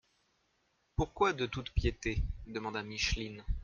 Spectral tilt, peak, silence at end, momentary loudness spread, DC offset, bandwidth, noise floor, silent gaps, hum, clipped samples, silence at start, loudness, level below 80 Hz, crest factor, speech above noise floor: -5 dB/octave; -16 dBFS; 0 s; 9 LU; under 0.1%; 7.4 kHz; -76 dBFS; none; none; under 0.1%; 1 s; -36 LUFS; -42 dBFS; 20 dB; 42 dB